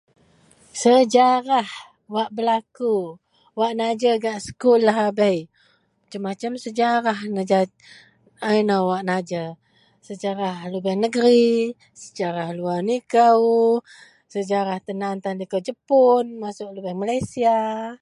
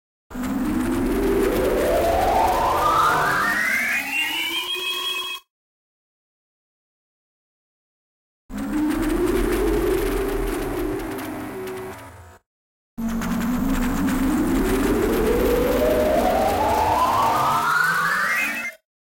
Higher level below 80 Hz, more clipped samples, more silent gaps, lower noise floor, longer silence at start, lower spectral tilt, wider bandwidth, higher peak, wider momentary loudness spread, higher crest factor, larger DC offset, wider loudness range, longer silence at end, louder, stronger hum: second, -64 dBFS vs -34 dBFS; neither; second, none vs 5.50-8.49 s, 12.46-12.97 s; first, -62 dBFS vs -42 dBFS; first, 0.75 s vs 0.3 s; about the same, -5.5 dB/octave vs -4.5 dB/octave; second, 11.5 kHz vs 16.5 kHz; first, -4 dBFS vs -10 dBFS; about the same, 14 LU vs 12 LU; about the same, 18 dB vs 14 dB; neither; second, 4 LU vs 10 LU; second, 0.05 s vs 0.4 s; about the same, -21 LUFS vs -21 LUFS; neither